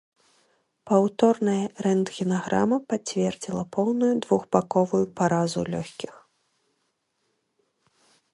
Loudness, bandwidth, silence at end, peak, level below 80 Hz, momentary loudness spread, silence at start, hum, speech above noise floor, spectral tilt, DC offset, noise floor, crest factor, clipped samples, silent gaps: -24 LUFS; 11.5 kHz; 2.25 s; -4 dBFS; -64 dBFS; 9 LU; 0.85 s; none; 51 dB; -6 dB/octave; under 0.1%; -74 dBFS; 22 dB; under 0.1%; none